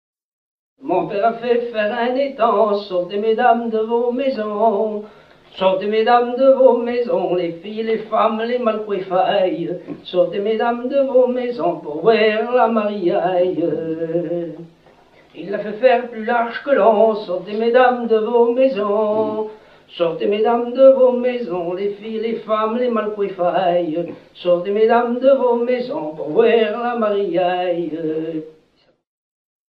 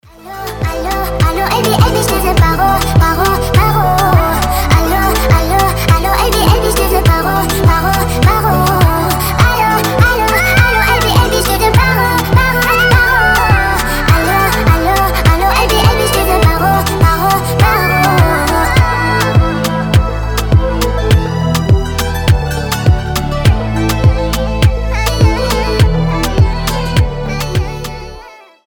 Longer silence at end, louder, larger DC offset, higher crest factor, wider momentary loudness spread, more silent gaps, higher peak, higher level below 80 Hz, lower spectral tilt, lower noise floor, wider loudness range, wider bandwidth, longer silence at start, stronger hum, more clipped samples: first, 1.25 s vs 0.3 s; second, -18 LUFS vs -11 LUFS; neither; first, 18 dB vs 10 dB; first, 10 LU vs 6 LU; neither; about the same, 0 dBFS vs 0 dBFS; second, -64 dBFS vs -18 dBFS; first, -8 dB/octave vs -5 dB/octave; first, -59 dBFS vs -35 dBFS; about the same, 4 LU vs 3 LU; second, 5.2 kHz vs over 20 kHz; first, 0.8 s vs 0.25 s; neither; neither